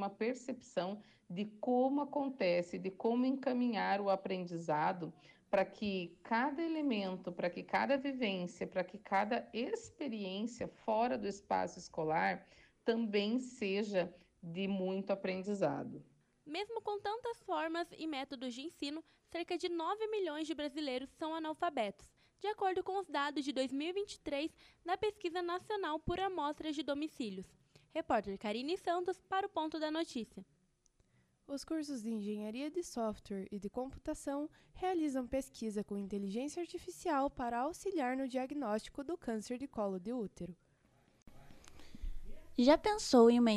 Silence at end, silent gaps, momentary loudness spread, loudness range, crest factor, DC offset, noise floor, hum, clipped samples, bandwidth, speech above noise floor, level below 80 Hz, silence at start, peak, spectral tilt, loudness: 0 s; none; 10 LU; 5 LU; 24 dB; under 0.1%; -74 dBFS; none; under 0.1%; 13 kHz; 37 dB; -62 dBFS; 0 s; -14 dBFS; -5 dB/octave; -38 LUFS